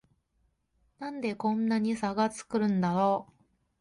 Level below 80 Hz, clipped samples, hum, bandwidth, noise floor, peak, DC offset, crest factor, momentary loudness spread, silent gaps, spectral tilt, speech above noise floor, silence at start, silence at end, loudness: -66 dBFS; under 0.1%; none; 11.5 kHz; -74 dBFS; -16 dBFS; under 0.1%; 16 dB; 8 LU; none; -6.5 dB/octave; 45 dB; 1 s; 0.55 s; -29 LUFS